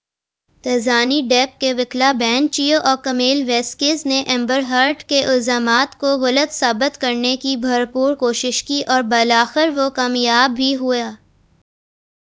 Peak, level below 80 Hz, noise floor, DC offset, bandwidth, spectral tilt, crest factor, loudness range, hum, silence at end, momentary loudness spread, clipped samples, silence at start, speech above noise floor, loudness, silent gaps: 0 dBFS; -58 dBFS; -73 dBFS; under 0.1%; 8 kHz; -2 dB/octave; 18 dB; 1 LU; none; 1.05 s; 5 LU; under 0.1%; 0.65 s; 57 dB; -16 LUFS; none